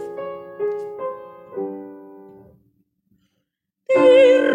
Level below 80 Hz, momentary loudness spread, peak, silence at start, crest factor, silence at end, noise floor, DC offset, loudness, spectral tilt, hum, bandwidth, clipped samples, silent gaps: -68 dBFS; 25 LU; -4 dBFS; 0 s; 16 dB; 0 s; -76 dBFS; under 0.1%; -18 LUFS; -5 dB/octave; none; 9 kHz; under 0.1%; none